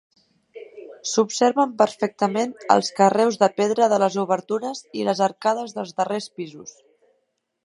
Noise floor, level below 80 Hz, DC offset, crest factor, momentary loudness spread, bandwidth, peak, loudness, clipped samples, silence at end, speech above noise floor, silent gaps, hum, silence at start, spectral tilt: -72 dBFS; -74 dBFS; under 0.1%; 22 dB; 16 LU; 11.5 kHz; 0 dBFS; -21 LUFS; under 0.1%; 0.95 s; 51 dB; none; none; 0.55 s; -4.5 dB/octave